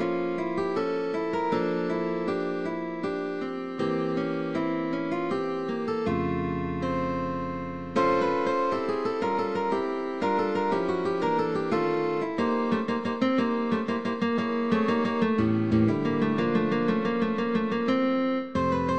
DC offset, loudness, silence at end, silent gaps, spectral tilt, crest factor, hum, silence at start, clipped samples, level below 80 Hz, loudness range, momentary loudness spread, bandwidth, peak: 0.3%; -27 LUFS; 0 s; none; -7.5 dB/octave; 16 dB; none; 0 s; under 0.1%; -56 dBFS; 4 LU; 5 LU; 8.8 kHz; -12 dBFS